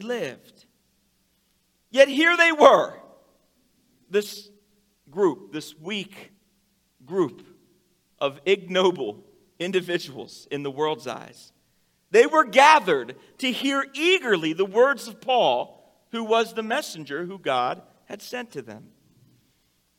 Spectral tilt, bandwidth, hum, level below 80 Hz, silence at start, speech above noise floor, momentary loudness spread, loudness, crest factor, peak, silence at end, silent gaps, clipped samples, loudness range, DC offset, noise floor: -3.5 dB/octave; 16.5 kHz; none; -76 dBFS; 0 s; 46 dB; 21 LU; -22 LUFS; 24 dB; 0 dBFS; 1.2 s; none; under 0.1%; 10 LU; under 0.1%; -68 dBFS